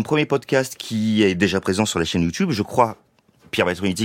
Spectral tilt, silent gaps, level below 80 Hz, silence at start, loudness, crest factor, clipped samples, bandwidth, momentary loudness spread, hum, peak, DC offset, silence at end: -5 dB/octave; none; -50 dBFS; 0 s; -20 LUFS; 18 dB; under 0.1%; 16.5 kHz; 4 LU; none; -2 dBFS; under 0.1%; 0 s